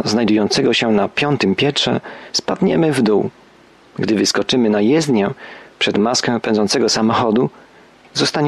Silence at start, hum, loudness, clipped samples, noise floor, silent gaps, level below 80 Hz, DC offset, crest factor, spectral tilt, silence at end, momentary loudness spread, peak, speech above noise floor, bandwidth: 0 s; none; -16 LUFS; under 0.1%; -47 dBFS; none; -54 dBFS; under 0.1%; 12 dB; -4.5 dB/octave; 0 s; 8 LU; -4 dBFS; 31 dB; 12.5 kHz